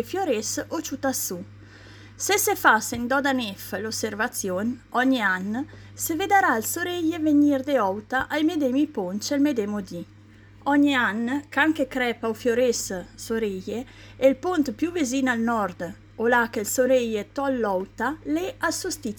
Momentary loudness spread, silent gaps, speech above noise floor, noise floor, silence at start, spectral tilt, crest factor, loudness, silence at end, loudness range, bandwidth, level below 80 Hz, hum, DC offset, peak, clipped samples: 11 LU; none; 25 dB; -49 dBFS; 0 s; -3.5 dB/octave; 20 dB; -24 LUFS; 0 s; 3 LU; 19 kHz; -56 dBFS; none; under 0.1%; -4 dBFS; under 0.1%